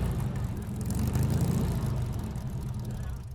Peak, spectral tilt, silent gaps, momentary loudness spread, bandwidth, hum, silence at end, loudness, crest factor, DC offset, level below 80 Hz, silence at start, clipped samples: -16 dBFS; -7 dB/octave; none; 8 LU; 19 kHz; none; 0 s; -32 LUFS; 14 dB; under 0.1%; -38 dBFS; 0 s; under 0.1%